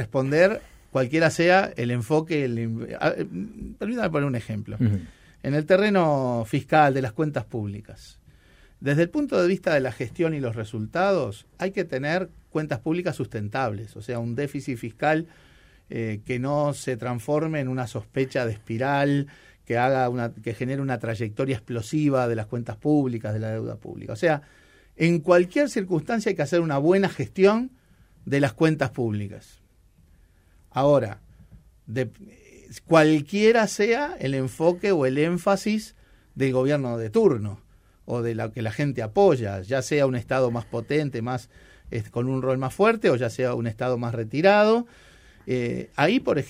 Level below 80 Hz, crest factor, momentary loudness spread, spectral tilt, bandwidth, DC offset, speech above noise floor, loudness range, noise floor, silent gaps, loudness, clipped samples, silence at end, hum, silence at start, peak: -56 dBFS; 20 dB; 12 LU; -6.5 dB/octave; 15.5 kHz; under 0.1%; 34 dB; 5 LU; -58 dBFS; none; -24 LUFS; under 0.1%; 0 s; none; 0 s; -4 dBFS